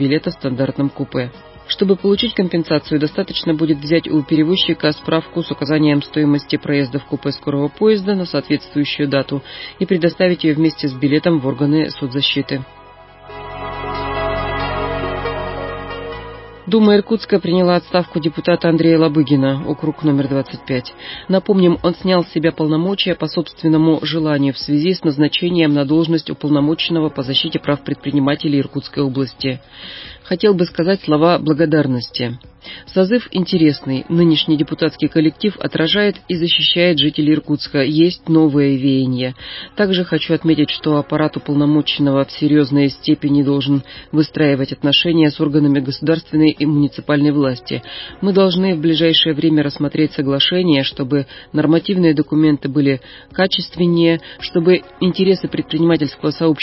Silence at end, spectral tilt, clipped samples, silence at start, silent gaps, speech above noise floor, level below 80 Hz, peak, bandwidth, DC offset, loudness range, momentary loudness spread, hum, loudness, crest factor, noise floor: 0 s; -10.5 dB/octave; under 0.1%; 0 s; none; 25 dB; -44 dBFS; -2 dBFS; 5.8 kHz; under 0.1%; 4 LU; 9 LU; none; -16 LUFS; 14 dB; -41 dBFS